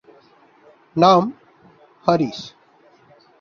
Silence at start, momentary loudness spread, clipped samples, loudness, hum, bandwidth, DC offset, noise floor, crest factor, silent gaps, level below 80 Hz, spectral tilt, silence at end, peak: 0.95 s; 18 LU; under 0.1%; -18 LUFS; none; 7.2 kHz; under 0.1%; -54 dBFS; 20 dB; none; -62 dBFS; -6.5 dB/octave; 0.9 s; -2 dBFS